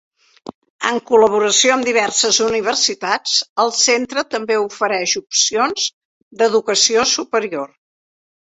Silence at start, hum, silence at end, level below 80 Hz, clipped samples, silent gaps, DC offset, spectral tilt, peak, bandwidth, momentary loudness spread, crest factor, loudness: 0.45 s; none; 0.8 s; -60 dBFS; under 0.1%; 0.54-0.62 s, 0.70-0.79 s, 3.49-3.56 s, 5.93-6.31 s; under 0.1%; -0.5 dB/octave; 0 dBFS; 8.2 kHz; 8 LU; 18 dB; -15 LUFS